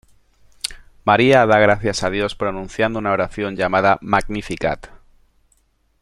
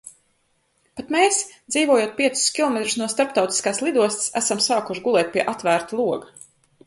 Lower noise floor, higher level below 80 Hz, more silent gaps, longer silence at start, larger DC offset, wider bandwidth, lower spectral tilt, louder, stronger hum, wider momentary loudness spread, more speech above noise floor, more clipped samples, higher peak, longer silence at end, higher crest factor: second, -61 dBFS vs -67 dBFS; first, -42 dBFS vs -66 dBFS; neither; first, 0.65 s vs 0.05 s; neither; first, 15.5 kHz vs 11.5 kHz; first, -5 dB/octave vs -2 dB/octave; first, -18 LUFS vs -21 LUFS; neither; first, 15 LU vs 6 LU; about the same, 44 dB vs 46 dB; neither; about the same, -2 dBFS vs -4 dBFS; first, 1.15 s vs 0.6 s; about the same, 18 dB vs 20 dB